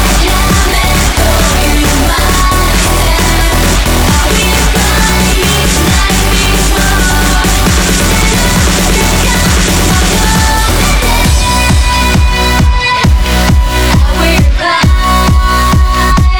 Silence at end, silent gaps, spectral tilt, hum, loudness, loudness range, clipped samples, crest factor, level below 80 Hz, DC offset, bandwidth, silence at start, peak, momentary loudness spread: 0 s; none; -3.5 dB/octave; none; -8 LUFS; 0 LU; under 0.1%; 8 dB; -10 dBFS; under 0.1%; over 20 kHz; 0 s; 0 dBFS; 1 LU